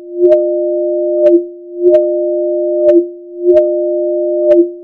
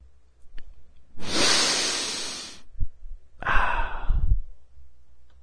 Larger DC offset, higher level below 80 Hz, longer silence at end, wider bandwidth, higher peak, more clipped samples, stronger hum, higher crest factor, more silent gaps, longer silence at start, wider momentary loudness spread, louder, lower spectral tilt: neither; second, -56 dBFS vs -30 dBFS; about the same, 0 s vs 0 s; second, 3.3 kHz vs 11 kHz; first, 0 dBFS vs -4 dBFS; first, 0.2% vs under 0.1%; neither; second, 12 dB vs 20 dB; neither; second, 0 s vs 0.4 s; second, 5 LU vs 19 LU; first, -12 LUFS vs -25 LUFS; first, -8.5 dB/octave vs -1.5 dB/octave